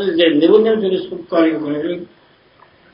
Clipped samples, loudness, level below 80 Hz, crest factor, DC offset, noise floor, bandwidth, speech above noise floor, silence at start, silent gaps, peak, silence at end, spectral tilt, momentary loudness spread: under 0.1%; -15 LUFS; -60 dBFS; 16 dB; under 0.1%; -50 dBFS; 5.4 kHz; 35 dB; 0 s; none; 0 dBFS; 0.9 s; -9 dB/octave; 11 LU